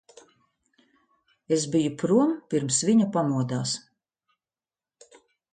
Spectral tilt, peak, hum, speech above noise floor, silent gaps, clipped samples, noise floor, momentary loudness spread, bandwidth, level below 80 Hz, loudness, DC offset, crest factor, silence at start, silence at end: -5 dB/octave; -10 dBFS; none; over 66 dB; none; under 0.1%; under -90 dBFS; 7 LU; 9.4 kHz; -70 dBFS; -25 LUFS; under 0.1%; 18 dB; 1.5 s; 1.75 s